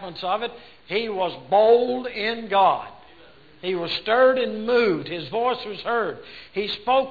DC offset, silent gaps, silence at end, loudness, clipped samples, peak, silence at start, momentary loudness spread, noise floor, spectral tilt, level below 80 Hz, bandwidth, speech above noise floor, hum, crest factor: 0.2%; none; 0 s; -22 LUFS; under 0.1%; -6 dBFS; 0 s; 11 LU; -51 dBFS; -6.5 dB/octave; -60 dBFS; 4.9 kHz; 28 dB; none; 16 dB